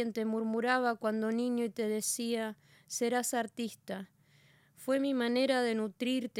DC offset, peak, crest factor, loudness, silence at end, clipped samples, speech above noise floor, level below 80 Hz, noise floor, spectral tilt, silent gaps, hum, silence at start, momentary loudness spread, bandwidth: under 0.1%; -16 dBFS; 16 dB; -33 LUFS; 0 s; under 0.1%; 32 dB; -86 dBFS; -65 dBFS; -3.5 dB/octave; none; none; 0 s; 11 LU; 16.5 kHz